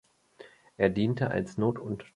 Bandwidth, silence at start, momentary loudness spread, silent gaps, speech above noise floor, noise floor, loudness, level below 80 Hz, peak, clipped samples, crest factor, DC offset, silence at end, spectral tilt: 11 kHz; 0.4 s; 4 LU; none; 26 dB; -54 dBFS; -29 LUFS; -58 dBFS; -8 dBFS; under 0.1%; 22 dB; under 0.1%; 0.1 s; -8 dB/octave